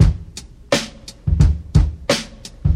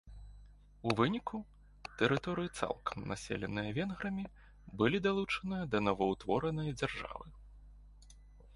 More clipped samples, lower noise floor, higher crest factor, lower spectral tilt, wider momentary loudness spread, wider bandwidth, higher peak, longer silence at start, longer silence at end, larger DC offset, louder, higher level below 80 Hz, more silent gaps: neither; second, -37 dBFS vs -57 dBFS; about the same, 18 dB vs 22 dB; about the same, -5.5 dB/octave vs -6 dB/octave; about the same, 17 LU vs 18 LU; first, 14 kHz vs 11.5 kHz; first, 0 dBFS vs -14 dBFS; about the same, 0 s vs 0.05 s; about the same, 0 s vs 0 s; neither; first, -19 LUFS vs -36 LUFS; first, -22 dBFS vs -56 dBFS; neither